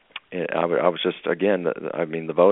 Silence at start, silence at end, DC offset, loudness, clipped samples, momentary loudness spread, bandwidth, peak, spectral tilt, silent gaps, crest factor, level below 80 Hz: 0.15 s; 0 s; under 0.1%; -24 LUFS; under 0.1%; 7 LU; 4 kHz; -2 dBFS; -4 dB/octave; none; 20 dB; -70 dBFS